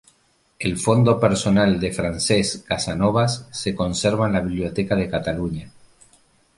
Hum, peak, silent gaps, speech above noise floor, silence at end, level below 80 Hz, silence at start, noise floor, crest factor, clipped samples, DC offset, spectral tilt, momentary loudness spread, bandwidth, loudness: none; -4 dBFS; none; 42 dB; 0.9 s; -42 dBFS; 0.6 s; -62 dBFS; 18 dB; under 0.1%; under 0.1%; -5.5 dB/octave; 9 LU; 11.5 kHz; -21 LUFS